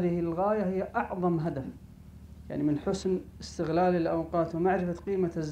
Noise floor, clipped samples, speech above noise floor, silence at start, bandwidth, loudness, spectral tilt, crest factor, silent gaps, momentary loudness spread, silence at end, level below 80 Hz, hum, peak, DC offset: -49 dBFS; under 0.1%; 20 dB; 0 s; 10 kHz; -30 LUFS; -7.5 dB/octave; 14 dB; none; 13 LU; 0 s; -52 dBFS; 50 Hz at -55 dBFS; -16 dBFS; under 0.1%